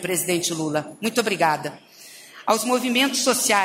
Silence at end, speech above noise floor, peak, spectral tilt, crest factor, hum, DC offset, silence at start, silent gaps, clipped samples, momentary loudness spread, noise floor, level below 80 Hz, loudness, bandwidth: 0 s; 23 dB; -4 dBFS; -2.5 dB/octave; 18 dB; none; under 0.1%; 0 s; none; under 0.1%; 13 LU; -45 dBFS; -70 dBFS; -22 LUFS; 16 kHz